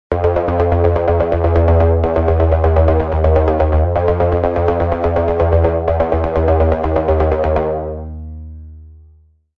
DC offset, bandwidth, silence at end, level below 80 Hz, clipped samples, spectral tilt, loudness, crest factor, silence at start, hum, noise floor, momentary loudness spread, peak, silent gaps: under 0.1%; 4.3 kHz; 0.65 s; -24 dBFS; under 0.1%; -10.5 dB/octave; -15 LUFS; 14 dB; 0.1 s; none; -49 dBFS; 6 LU; 0 dBFS; none